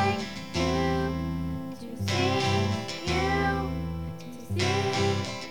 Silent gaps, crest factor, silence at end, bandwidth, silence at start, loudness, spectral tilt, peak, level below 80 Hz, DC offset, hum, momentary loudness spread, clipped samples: none; 14 dB; 0 s; 19 kHz; 0 s; -28 LUFS; -5.5 dB/octave; -14 dBFS; -44 dBFS; 0.5%; none; 9 LU; under 0.1%